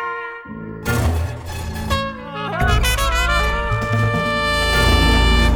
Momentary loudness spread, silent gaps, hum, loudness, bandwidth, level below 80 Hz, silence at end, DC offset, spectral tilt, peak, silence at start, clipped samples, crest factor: 13 LU; none; none; -18 LUFS; 19.5 kHz; -22 dBFS; 0 s; under 0.1%; -4.5 dB/octave; -2 dBFS; 0 s; under 0.1%; 16 dB